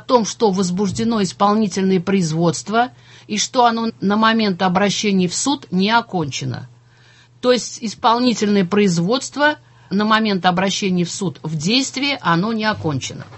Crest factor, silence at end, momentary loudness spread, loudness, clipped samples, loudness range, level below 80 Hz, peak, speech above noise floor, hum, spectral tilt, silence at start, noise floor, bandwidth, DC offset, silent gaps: 18 dB; 0 s; 8 LU; -18 LUFS; under 0.1%; 2 LU; -54 dBFS; 0 dBFS; 31 dB; none; -4.5 dB/octave; 0.1 s; -49 dBFS; 8.6 kHz; under 0.1%; none